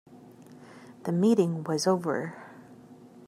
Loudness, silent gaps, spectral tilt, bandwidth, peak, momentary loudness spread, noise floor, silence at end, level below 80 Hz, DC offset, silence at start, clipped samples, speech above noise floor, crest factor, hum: -27 LUFS; none; -6 dB/octave; 15.5 kHz; -12 dBFS; 25 LU; -51 dBFS; 0 s; -78 dBFS; under 0.1%; 0.1 s; under 0.1%; 25 dB; 18 dB; none